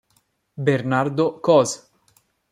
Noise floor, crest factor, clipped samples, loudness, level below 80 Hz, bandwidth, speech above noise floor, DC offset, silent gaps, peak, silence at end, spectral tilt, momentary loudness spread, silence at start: -66 dBFS; 18 dB; under 0.1%; -20 LUFS; -66 dBFS; 14.5 kHz; 47 dB; under 0.1%; none; -4 dBFS; 0.75 s; -5.5 dB/octave; 8 LU; 0.6 s